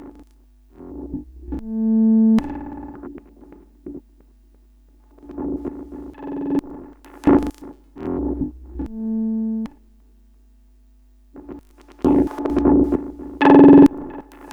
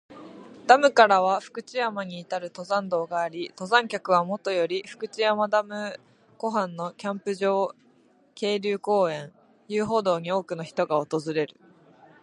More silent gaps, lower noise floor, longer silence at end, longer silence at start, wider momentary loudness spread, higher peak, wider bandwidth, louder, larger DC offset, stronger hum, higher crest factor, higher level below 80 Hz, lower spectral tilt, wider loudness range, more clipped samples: neither; second, -51 dBFS vs -60 dBFS; second, 0 s vs 0.75 s; about the same, 0 s vs 0.1 s; first, 25 LU vs 15 LU; about the same, 0 dBFS vs -2 dBFS; second, 5.4 kHz vs 11 kHz; first, -17 LUFS vs -25 LUFS; neither; neither; about the same, 20 dB vs 24 dB; first, -40 dBFS vs -74 dBFS; first, -9 dB/octave vs -4.5 dB/octave; first, 17 LU vs 5 LU; neither